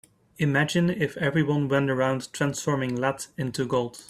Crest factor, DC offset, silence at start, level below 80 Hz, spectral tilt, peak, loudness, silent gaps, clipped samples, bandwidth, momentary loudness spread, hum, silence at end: 16 dB; under 0.1%; 0.4 s; -60 dBFS; -5.5 dB/octave; -10 dBFS; -26 LUFS; none; under 0.1%; 14.5 kHz; 5 LU; none; 0.05 s